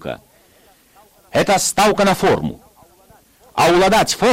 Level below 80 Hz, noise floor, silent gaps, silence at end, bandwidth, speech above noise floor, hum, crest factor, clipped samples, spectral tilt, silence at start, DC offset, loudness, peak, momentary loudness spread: -42 dBFS; -52 dBFS; none; 0 s; 16.5 kHz; 37 dB; none; 12 dB; under 0.1%; -3.5 dB/octave; 0.05 s; under 0.1%; -15 LUFS; -6 dBFS; 14 LU